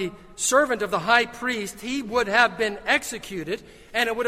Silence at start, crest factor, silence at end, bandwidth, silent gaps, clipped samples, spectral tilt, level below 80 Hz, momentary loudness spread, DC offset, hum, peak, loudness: 0 s; 22 dB; 0 s; 16 kHz; none; under 0.1%; -2 dB/octave; -54 dBFS; 12 LU; under 0.1%; none; -2 dBFS; -23 LUFS